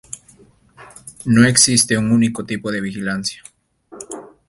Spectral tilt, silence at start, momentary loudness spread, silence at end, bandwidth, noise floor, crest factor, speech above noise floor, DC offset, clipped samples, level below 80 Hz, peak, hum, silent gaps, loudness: -3.5 dB/octave; 0.15 s; 26 LU; 0.2 s; 12 kHz; -50 dBFS; 20 dB; 34 dB; under 0.1%; under 0.1%; -52 dBFS; 0 dBFS; none; none; -16 LUFS